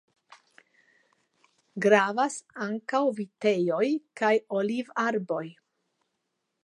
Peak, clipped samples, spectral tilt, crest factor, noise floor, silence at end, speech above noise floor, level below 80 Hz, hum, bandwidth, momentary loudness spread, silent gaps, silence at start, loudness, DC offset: -6 dBFS; under 0.1%; -5 dB/octave; 24 dB; -80 dBFS; 1.15 s; 54 dB; -84 dBFS; none; 11 kHz; 12 LU; none; 1.75 s; -27 LUFS; under 0.1%